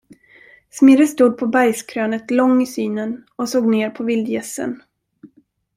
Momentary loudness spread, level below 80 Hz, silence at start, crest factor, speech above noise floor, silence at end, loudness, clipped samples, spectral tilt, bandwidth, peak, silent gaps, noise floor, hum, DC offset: 14 LU; -64 dBFS; 0.75 s; 16 dB; 39 dB; 0.5 s; -17 LUFS; under 0.1%; -5 dB/octave; 15.5 kHz; -2 dBFS; none; -56 dBFS; none; under 0.1%